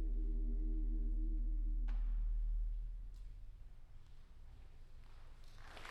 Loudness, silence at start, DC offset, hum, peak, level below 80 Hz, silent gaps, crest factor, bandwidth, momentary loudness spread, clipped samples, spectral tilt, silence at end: -45 LUFS; 0 s; under 0.1%; none; -32 dBFS; -40 dBFS; none; 8 dB; 4.5 kHz; 20 LU; under 0.1%; -7.5 dB/octave; 0 s